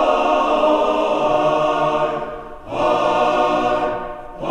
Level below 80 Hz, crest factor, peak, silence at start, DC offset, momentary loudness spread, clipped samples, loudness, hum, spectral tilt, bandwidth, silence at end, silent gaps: -42 dBFS; 14 dB; -4 dBFS; 0 s; under 0.1%; 12 LU; under 0.1%; -18 LUFS; none; -5 dB/octave; 9.8 kHz; 0 s; none